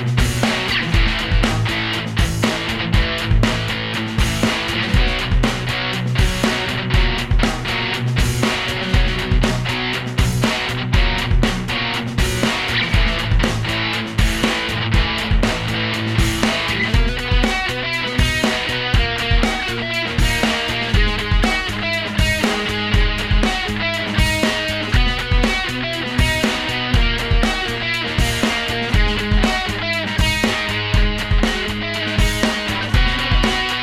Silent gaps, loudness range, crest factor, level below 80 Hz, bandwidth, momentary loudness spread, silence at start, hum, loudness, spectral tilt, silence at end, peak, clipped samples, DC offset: none; 1 LU; 16 dB; -22 dBFS; 15.5 kHz; 3 LU; 0 s; none; -18 LUFS; -4.5 dB/octave; 0 s; 0 dBFS; under 0.1%; under 0.1%